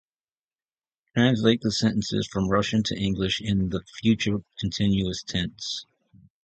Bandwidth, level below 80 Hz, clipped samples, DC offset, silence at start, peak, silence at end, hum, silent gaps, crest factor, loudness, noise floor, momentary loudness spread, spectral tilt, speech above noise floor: 8.8 kHz; -48 dBFS; under 0.1%; under 0.1%; 1.15 s; -4 dBFS; 0.6 s; none; none; 20 dB; -25 LUFS; under -90 dBFS; 8 LU; -5.5 dB/octave; over 66 dB